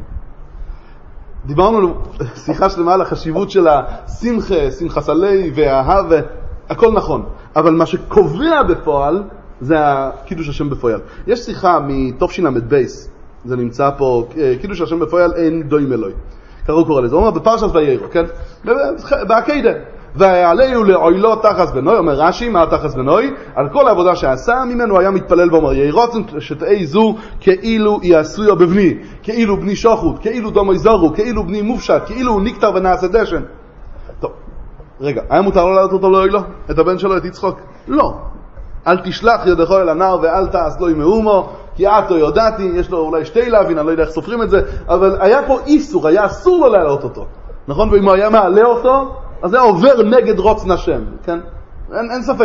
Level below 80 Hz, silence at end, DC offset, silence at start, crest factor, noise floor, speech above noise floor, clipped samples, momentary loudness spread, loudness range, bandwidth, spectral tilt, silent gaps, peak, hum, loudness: -30 dBFS; 0 s; under 0.1%; 0 s; 14 dB; -34 dBFS; 21 dB; under 0.1%; 12 LU; 5 LU; 7.2 kHz; -7 dB/octave; none; 0 dBFS; none; -13 LUFS